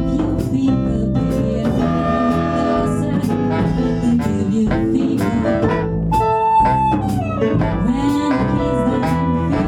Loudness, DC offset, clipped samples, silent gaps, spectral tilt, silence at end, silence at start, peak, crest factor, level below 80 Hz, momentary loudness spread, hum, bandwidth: -17 LUFS; under 0.1%; under 0.1%; none; -8 dB/octave; 0 s; 0 s; -2 dBFS; 14 dB; -30 dBFS; 3 LU; none; 14 kHz